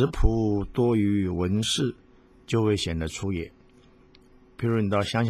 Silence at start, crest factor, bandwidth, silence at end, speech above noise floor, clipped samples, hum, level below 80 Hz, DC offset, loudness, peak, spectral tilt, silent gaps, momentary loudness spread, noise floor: 0 s; 18 dB; 14.5 kHz; 0 s; 31 dB; under 0.1%; none; -36 dBFS; under 0.1%; -26 LUFS; -6 dBFS; -6 dB/octave; none; 7 LU; -55 dBFS